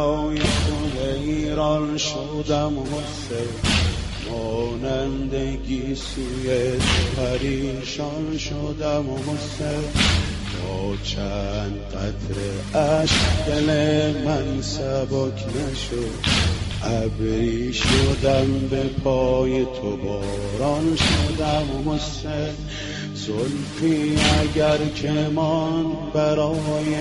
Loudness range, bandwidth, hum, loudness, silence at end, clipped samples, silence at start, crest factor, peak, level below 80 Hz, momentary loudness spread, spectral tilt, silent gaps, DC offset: 3 LU; 11.5 kHz; none; -23 LUFS; 0 s; under 0.1%; 0 s; 18 dB; -4 dBFS; -32 dBFS; 9 LU; -5 dB/octave; none; under 0.1%